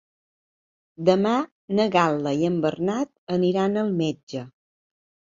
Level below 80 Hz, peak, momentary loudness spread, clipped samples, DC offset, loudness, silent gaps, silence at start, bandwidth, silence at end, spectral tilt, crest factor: -66 dBFS; -4 dBFS; 8 LU; under 0.1%; under 0.1%; -23 LUFS; 1.51-1.68 s, 3.18-3.27 s, 4.23-4.27 s; 1 s; 7.6 kHz; 0.9 s; -6.5 dB/octave; 20 dB